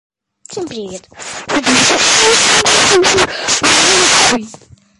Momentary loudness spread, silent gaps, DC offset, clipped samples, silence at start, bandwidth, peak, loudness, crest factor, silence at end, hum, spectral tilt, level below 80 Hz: 19 LU; none; under 0.1%; under 0.1%; 0.5 s; 11.5 kHz; 0 dBFS; -9 LUFS; 12 dB; 0.45 s; none; -1 dB/octave; -44 dBFS